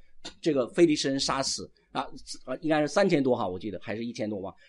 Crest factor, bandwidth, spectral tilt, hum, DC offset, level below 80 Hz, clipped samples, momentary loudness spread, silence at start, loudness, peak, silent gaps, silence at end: 18 dB; 11.5 kHz; -4.5 dB/octave; none; under 0.1%; -58 dBFS; under 0.1%; 13 LU; 0.05 s; -28 LUFS; -10 dBFS; none; 0.2 s